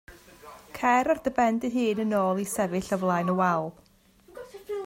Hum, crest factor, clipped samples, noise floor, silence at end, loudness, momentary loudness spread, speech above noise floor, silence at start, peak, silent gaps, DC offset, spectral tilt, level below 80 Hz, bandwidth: none; 18 dB; under 0.1%; -57 dBFS; 0 s; -26 LUFS; 17 LU; 32 dB; 0.1 s; -10 dBFS; none; under 0.1%; -5.5 dB/octave; -60 dBFS; 16 kHz